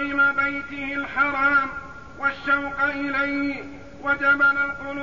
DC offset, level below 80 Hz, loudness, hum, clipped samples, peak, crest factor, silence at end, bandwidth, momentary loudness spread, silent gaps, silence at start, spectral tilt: 0.5%; -52 dBFS; -22 LUFS; none; under 0.1%; -8 dBFS; 16 dB; 0 s; 7.4 kHz; 12 LU; none; 0 s; -5.5 dB/octave